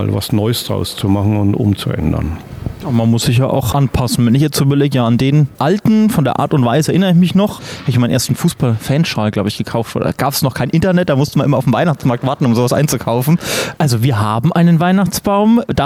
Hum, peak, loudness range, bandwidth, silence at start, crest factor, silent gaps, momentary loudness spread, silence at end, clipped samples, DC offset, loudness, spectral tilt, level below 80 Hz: none; -4 dBFS; 3 LU; 16 kHz; 0 s; 10 dB; none; 6 LU; 0 s; under 0.1%; under 0.1%; -14 LUFS; -6 dB/octave; -36 dBFS